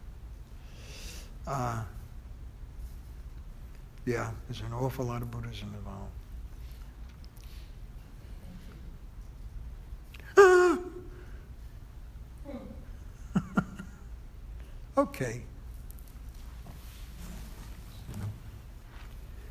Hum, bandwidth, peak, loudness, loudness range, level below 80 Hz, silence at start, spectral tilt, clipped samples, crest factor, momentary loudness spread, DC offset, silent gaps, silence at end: none; 15.5 kHz; -6 dBFS; -30 LUFS; 19 LU; -46 dBFS; 0 s; -6 dB/octave; under 0.1%; 28 dB; 18 LU; under 0.1%; none; 0 s